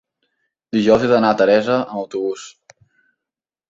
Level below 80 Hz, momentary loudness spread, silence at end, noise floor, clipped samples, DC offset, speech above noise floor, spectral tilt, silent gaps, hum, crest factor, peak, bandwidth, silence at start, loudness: -56 dBFS; 12 LU; 1.2 s; -87 dBFS; under 0.1%; under 0.1%; 70 dB; -6 dB/octave; none; none; 18 dB; -2 dBFS; 7.8 kHz; 0.75 s; -17 LUFS